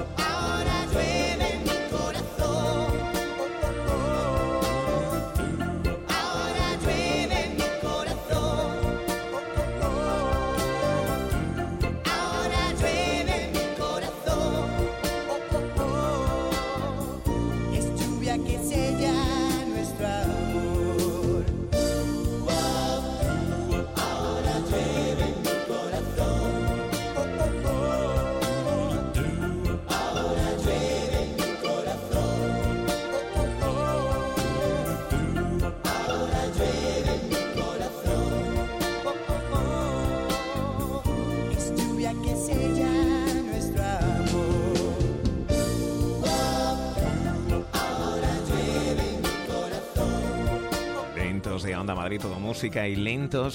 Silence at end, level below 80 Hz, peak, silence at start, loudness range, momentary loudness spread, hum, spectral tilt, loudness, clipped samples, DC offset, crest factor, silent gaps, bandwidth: 0 s; -34 dBFS; -14 dBFS; 0 s; 2 LU; 4 LU; none; -5.5 dB/octave; -27 LUFS; under 0.1%; under 0.1%; 12 dB; none; 17 kHz